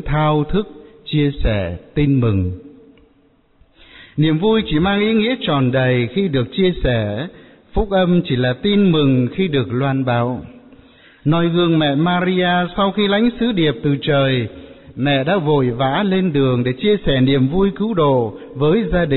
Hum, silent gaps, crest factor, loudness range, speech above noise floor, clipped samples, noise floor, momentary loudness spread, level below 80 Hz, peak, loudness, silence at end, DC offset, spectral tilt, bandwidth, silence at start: none; none; 12 dB; 3 LU; 39 dB; under 0.1%; -55 dBFS; 7 LU; -34 dBFS; -6 dBFS; -17 LUFS; 0 s; 0.4%; -5.5 dB/octave; 4.2 kHz; 0 s